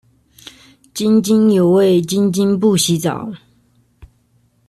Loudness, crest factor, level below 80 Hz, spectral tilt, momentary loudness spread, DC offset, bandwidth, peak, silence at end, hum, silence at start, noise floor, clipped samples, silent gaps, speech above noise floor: -14 LUFS; 12 dB; -54 dBFS; -5.5 dB/octave; 12 LU; under 0.1%; 13.5 kHz; -4 dBFS; 1.3 s; none; 0.95 s; -58 dBFS; under 0.1%; none; 44 dB